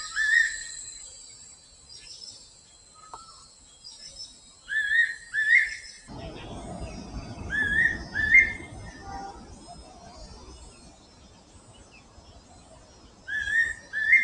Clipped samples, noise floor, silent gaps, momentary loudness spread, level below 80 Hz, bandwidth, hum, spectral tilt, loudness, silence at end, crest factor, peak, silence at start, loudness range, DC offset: under 0.1%; -54 dBFS; none; 26 LU; -50 dBFS; 10.5 kHz; none; -2 dB/octave; -23 LUFS; 0 s; 22 dB; -6 dBFS; 0 s; 20 LU; under 0.1%